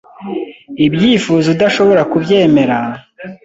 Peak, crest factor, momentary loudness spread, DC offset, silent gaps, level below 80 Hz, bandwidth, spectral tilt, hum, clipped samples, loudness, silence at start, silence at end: 0 dBFS; 12 dB; 15 LU; under 0.1%; none; -50 dBFS; 8 kHz; -6 dB/octave; none; under 0.1%; -12 LUFS; 0.2 s; 0.1 s